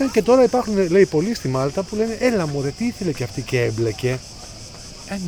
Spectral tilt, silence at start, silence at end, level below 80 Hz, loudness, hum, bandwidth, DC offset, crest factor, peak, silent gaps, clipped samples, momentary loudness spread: -6 dB/octave; 0 s; 0 s; -44 dBFS; -20 LUFS; none; 19.5 kHz; under 0.1%; 16 dB; -4 dBFS; none; under 0.1%; 20 LU